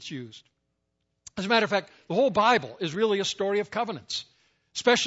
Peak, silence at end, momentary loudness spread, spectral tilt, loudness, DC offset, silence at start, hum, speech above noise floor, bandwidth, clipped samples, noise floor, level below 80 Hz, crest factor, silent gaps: -8 dBFS; 0 s; 15 LU; -3.5 dB/octave; -26 LUFS; under 0.1%; 0 s; none; 52 dB; 8 kHz; under 0.1%; -78 dBFS; -68 dBFS; 20 dB; none